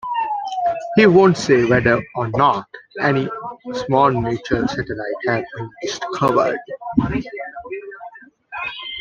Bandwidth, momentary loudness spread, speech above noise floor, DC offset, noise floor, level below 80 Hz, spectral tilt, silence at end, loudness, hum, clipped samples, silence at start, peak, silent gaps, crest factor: 9.2 kHz; 17 LU; 22 dB; under 0.1%; -40 dBFS; -46 dBFS; -6 dB/octave; 0 s; -18 LUFS; none; under 0.1%; 0.05 s; -2 dBFS; none; 18 dB